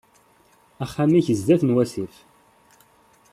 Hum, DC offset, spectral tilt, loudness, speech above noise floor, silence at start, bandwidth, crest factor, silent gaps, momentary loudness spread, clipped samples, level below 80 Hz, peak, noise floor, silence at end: none; under 0.1%; -7.5 dB/octave; -21 LUFS; 38 dB; 0.8 s; 14 kHz; 18 dB; none; 15 LU; under 0.1%; -60 dBFS; -6 dBFS; -58 dBFS; 1.25 s